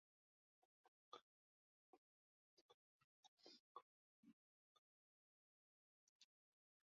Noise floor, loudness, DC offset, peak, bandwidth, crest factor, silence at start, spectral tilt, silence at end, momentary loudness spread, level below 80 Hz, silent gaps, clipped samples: under -90 dBFS; -67 LUFS; under 0.1%; -46 dBFS; 6.6 kHz; 30 dB; 0.6 s; -1 dB/octave; 0.6 s; 3 LU; under -90 dBFS; 0.65-1.12 s, 1.22-3.38 s, 3.60-3.75 s, 3.82-4.23 s, 4.33-6.20 s; under 0.1%